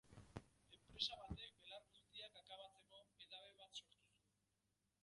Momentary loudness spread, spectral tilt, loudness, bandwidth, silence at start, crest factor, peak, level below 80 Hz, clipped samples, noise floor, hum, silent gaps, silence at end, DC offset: 17 LU; -3.5 dB/octave; -54 LUFS; 11 kHz; 0.05 s; 30 dB; -28 dBFS; -72 dBFS; under 0.1%; -88 dBFS; 50 Hz at -85 dBFS; none; 0.95 s; under 0.1%